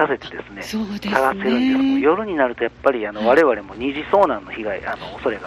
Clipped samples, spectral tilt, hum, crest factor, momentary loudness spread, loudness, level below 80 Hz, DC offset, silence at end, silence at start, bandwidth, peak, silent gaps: under 0.1%; -5.5 dB/octave; none; 18 dB; 11 LU; -20 LUFS; -50 dBFS; under 0.1%; 0 s; 0 s; 13.5 kHz; -2 dBFS; none